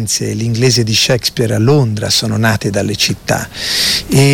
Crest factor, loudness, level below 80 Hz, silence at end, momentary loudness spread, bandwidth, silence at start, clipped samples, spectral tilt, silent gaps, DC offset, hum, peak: 12 dB; -13 LUFS; -40 dBFS; 0 s; 6 LU; 17.5 kHz; 0 s; under 0.1%; -4 dB/octave; none; under 0.1%; none; 0 dBFS